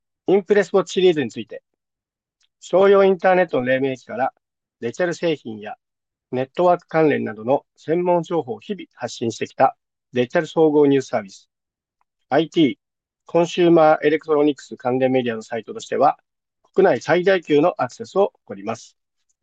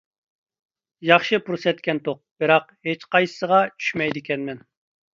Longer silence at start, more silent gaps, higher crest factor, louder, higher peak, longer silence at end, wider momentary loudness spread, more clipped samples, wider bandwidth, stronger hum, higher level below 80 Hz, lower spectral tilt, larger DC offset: second, 0.3 s vs 1 s; second, none vs 2.31-2.36 s; second, 16 dB vs 22 dB; about the same, -19 LUFS vs -21 LUFS; second, -4 dBFS vs 0 dBFS; about the same, 0.6 s vs 0.55 s; first, 15 LU vs 11 LU; neither; about the same, 8.2 kHz vs 7.6 kHz; neither; about the same, -68 dBFS vs -68 dBFS; about the same, -6 dB/octave vs -5.5 dB/octave; neither